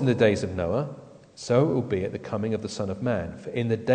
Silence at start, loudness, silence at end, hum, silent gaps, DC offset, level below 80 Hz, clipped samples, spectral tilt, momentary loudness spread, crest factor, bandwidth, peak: 0 s; -27 LUFS; 0 s; none; none; under 0.1%; -54 dBFS; under 0.1%; -7 dB/octave; 10 LU; 18 dB; 9.4 kHz; -8 dBFS